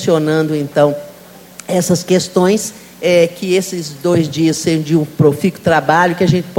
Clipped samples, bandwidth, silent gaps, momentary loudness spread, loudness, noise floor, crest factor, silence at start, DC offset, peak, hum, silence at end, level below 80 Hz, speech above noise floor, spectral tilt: under 0.1%; 17 kHz; none; 7 LU; -14 LUFS; -38 dBFS; 14 dB; 0 s; under 0.1%; 0 dBFS; none; 0 s; -50 dBFS; 25 dB; -5.5 dB/octave